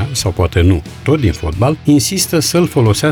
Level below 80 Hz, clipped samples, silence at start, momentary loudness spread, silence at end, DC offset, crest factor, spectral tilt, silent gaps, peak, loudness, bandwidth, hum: -28 dBFS; under 0.1%; 0 s; 5 LU; 0 s; under 0.1%; 10 dB; -5 dB/octave; none; -2 dBFS; -13 LUFS; 19 kHz; none